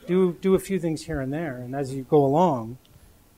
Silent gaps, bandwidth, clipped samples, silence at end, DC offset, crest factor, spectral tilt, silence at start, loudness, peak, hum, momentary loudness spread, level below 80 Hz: none; 16 kHz; under 0.1%; 0.6 s; under 0.1%; 16 dB; -7.5 dB/octave; 0.05 s; -24 LUFS; -8 dBFS; none; 11 LU; -50 dBFS